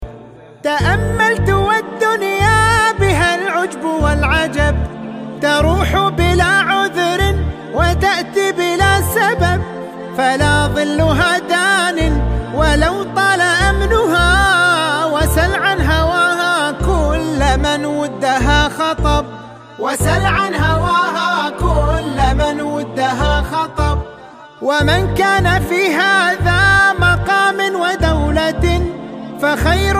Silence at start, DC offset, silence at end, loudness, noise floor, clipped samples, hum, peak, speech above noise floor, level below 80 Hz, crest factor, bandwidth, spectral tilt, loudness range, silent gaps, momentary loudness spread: 0 s; under 0.1%; 0 s; -14 LUFS; -37 dBFS; under 0.1%; none; -2 dBFS; 24 dB; -22 dBFS; 14 dB; 15.5 kHz; -5 dB/octave; 3 LU; none; 8 LU